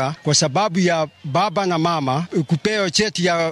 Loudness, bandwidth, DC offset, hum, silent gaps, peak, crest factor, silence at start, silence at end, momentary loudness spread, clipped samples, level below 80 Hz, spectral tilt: -19 LUFS; 12 kHz; under 0.1%; none; none; -4 dBFS; 16 dB; 0 s; 0 s; 4 LU; under 0.1%; -56 dBFS; -4 dB/octave